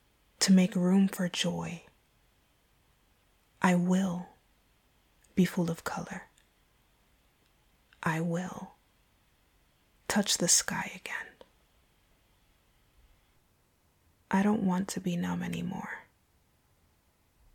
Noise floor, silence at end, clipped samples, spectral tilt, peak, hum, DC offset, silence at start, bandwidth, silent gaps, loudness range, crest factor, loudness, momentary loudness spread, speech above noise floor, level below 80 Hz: -69 dBFS; 1.55 s; under 0.1%; -4.5 dB/octave; -10 dBFS; none; under 0.1%; 0.4 s; 18 kHz; none; 9 LU; 24 dB; -30 LUFS; 18 LU; 40 dB; -66 dBFS